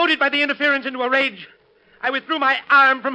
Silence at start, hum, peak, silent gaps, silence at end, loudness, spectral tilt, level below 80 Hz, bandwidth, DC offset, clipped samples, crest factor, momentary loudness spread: 0 s; none; -4 dBFS; none; 0 s; -18 LUFS; -3 dB/octave; -72 dBFS; 9 kHz; under 0.1%; under 0.1%; 16 dB; 10 LU